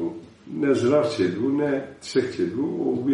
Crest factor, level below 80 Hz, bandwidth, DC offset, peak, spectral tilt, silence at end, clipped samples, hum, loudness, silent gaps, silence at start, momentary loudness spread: 16 dB; -64 dBFS; 11 kHz; under 0.1%; -8 dBFS; -6.5 dB/octave; 0 s; under 0.1%; none; -24 LUFS; none; 0 s; 10 LU